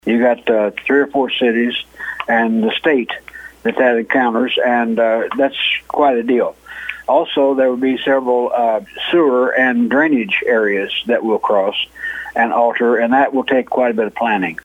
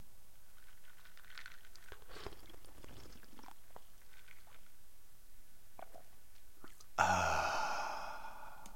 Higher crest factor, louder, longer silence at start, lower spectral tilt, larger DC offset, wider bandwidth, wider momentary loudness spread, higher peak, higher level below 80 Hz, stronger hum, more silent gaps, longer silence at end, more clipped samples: second, 14 dB vs 30 dB; first, -15 LUFS vs -39 LUFS; about the same, 0.05 s vs 0 s; first, -6 dB/octave vs -3 dB/octave; second, under 0.1% vs 0.6%; second, 11 kHz vs 16.5 kHz; second, 7 LU vs 28 LU; first, 0 dBFS vs -14 dBFS; first, -56 dBFS vs -62 dBFS; neither; neither; about the same, 0.1 s vs 0 s; neither